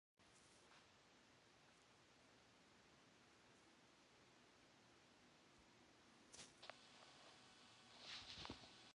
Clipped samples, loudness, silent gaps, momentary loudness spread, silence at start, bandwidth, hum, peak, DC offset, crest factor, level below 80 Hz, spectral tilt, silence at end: under 0.1%; -61 LUFS; none; 14 LU; 0.2 s; 10.5 kHz; none; -34 dBFS; under 0.1%; 32 dB; -84 dBFS; -2.5 dB/octave; 0.05 s